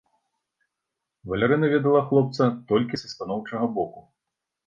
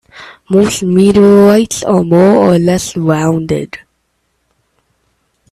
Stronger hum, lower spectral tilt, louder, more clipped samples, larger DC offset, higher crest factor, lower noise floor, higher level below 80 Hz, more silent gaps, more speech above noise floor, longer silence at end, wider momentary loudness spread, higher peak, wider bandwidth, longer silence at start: neither; first, -7.5 dB/octave vs -6 dB/octave; second, -24 LUFS vs -10 LUFS; neither; neither; first, 18 dB vs 10 dB; first, -84 dBFS vs -63 dBFS; second, -58 dBFS vs -42 dBFS; neither; first, 61 dB vs 54 dB; second, 0.65 s vs 1.75 s; about the same, 11 LU vs 11 LU; second, -6 dBFS vs 0 dBFS; second, 7.4 kHz vs 14 kHz; first, 1.25 s vs 0.15 s